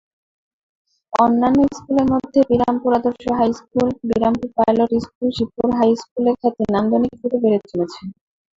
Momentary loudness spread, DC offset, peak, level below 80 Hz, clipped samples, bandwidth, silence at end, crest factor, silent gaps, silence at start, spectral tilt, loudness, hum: 6 LU; under 0.1%; -2 dBFS; -48 dBFS; under 0.1%; 7.6 kHz; 0.45 s; 16 dB; 5.15-5.21 s, 6.11-6.16 s; 1.1 s; -7 dB/octave; -18 LUFS; none